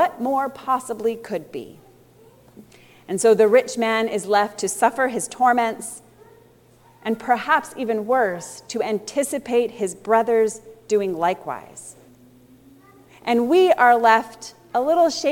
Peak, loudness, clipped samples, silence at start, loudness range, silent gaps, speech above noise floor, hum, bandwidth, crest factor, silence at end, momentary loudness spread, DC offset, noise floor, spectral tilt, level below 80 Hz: -2 dBFS; -20 LUFS; under 0.1%; 0 s; 5 LU; none; 33 dB; none; 18 kHz; 20 dB; 0 s; 17 LU; under 0.1%; -53 dBFS; -3.5 dB/octave; -66 dBFS